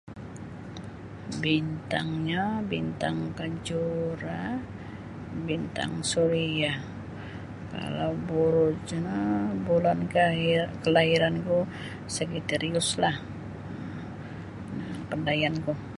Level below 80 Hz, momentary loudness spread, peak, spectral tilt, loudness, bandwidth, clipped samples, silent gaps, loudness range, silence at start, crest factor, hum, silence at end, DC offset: -52 dBFS; 16 LU; -8 dBFS; -5 dB/octave; -28 LUFS; 11.5 kHz; under 0.1%; none; 6 LU; 0.05 s; 22 dB; none; 0 s; under 0.1%